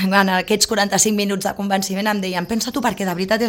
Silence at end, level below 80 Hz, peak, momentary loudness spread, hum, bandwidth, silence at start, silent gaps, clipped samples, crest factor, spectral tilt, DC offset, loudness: 0 s; -50 dBFS; 0 dBFS; 6 LU; none; 17 kHz; 0 s; none; under 0.1%; 18 dB; -3.5 dB/octave; under 0.1%; -18 LUFS